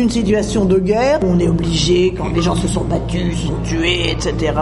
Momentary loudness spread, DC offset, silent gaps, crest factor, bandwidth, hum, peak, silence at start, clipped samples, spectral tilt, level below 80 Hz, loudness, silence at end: 5 LU; under 0.1%; none; 14 dB; 11.5 kHz; none; 0 dBFS; 0 s; under 0.1%; -5.5 dB/octave; -26 dBFS; -16 LUFS; 0 s